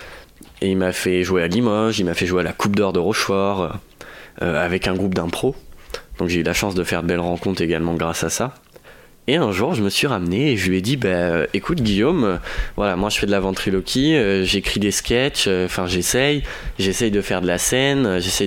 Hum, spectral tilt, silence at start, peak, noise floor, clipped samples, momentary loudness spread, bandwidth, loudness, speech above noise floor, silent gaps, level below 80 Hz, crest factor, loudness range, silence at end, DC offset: none; -4.5 dB/octave; 0 s; -4 dBFS; -46 dBFS; under 0.1%; 8 LU; 17 kHz; -19 LUFS; 26 dB; none; -38 dBFS; 16 dB; 3 LU; 0 s; under 0.1%